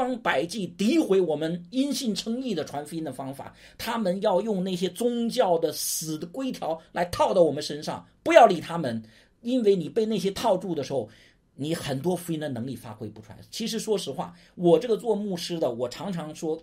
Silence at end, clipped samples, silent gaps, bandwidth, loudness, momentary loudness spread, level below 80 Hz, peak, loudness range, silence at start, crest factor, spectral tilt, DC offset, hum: 0 s; under 0.1%; none; 16 kHz; -26 LUFS; 14 LU; -60 dBFS; -2 dBFS; 7 LU; 0 s; 26 dB; -5 dB/octave; under 0.1%; none